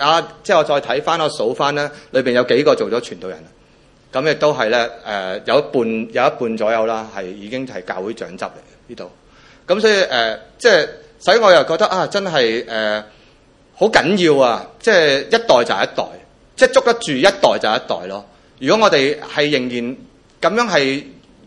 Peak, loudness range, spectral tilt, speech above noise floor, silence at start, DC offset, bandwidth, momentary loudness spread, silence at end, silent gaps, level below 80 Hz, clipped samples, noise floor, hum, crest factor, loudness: 0 dBFS; 5 LU; -4 dB/octave; 34 dB; 0 s; under 0.1%; 11.5 kHz; 14 LU; 0.35 s; none; -54 dBFS; under 0.1%; -50 dBFS; none; 16 dB; -16 LUFS